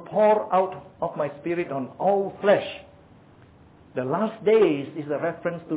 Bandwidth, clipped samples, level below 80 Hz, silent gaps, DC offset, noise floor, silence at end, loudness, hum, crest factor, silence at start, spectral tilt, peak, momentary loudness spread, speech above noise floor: 4 kHz; under 0.1%; -64 dBFS; none; under 0.1%; -52 dBFS; 0 s; -24 LUFS; none; 18 dB; 0 s; -10 dB/octave; -6 dBFS; 12 LU; 28 dB